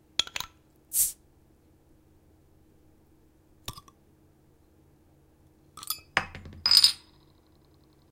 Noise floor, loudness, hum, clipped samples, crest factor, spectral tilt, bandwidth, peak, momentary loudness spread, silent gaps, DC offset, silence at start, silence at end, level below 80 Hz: -61 dBFS; -24 LUFS; none; under 0.1%; 32 dB; 1 dB/octave; 16.5 kHz; 0 dBFS; 25 LU; none; under 0.1%; 0.2 s; 1.15 s; -60 dBFS